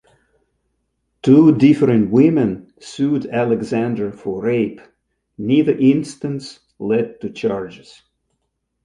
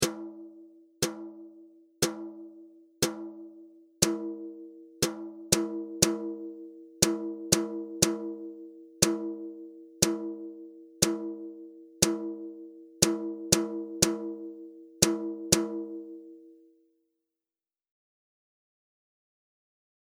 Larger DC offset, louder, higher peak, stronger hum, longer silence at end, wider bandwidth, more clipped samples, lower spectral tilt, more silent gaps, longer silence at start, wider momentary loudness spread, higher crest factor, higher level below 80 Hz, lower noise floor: neither; first, -17 LUFS vs -29 LUFS; about the same, -2 dBFS vs -2 dBFS; neither; second, 1.1 s vs 3.5 s; second, 10.5 kHz vs over 20 kHz; neither; first, -8 dB/octave vs -3 dB/octave; neither; first, 1.25 s vs 0 s; second, 16 LU vs 21 LU; second, 16 dB vs 30 dB; about the same, -56 dBFS vs -60 dBFS; second, -73 dBFS vs under -90 dBFS